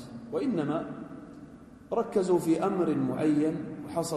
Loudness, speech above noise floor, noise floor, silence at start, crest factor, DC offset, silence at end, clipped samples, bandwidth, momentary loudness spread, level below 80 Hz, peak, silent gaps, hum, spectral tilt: -29 LUFS; 21 dB; -49 dBFS; 0 s; 16 dB; under 0.1%; 0 s; under 0.1%; 13.5 kHz; 18 LU; -64 dBFS; -14 dBFS; none; none; -7 dB/octave